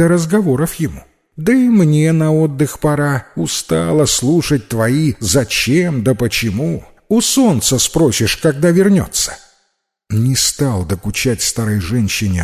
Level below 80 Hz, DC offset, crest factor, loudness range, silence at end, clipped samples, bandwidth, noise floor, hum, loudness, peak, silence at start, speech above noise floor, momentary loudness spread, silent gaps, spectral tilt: -36 dBFS; under 0.1%; 14 dB; 2 LU; 0 s; under 0.1%; 16 kHz; -66 dBFS; none; -14 LUFS; -2 dBFS; 0 s; 52 dB; 7 LU; none; -4.5 dB/octave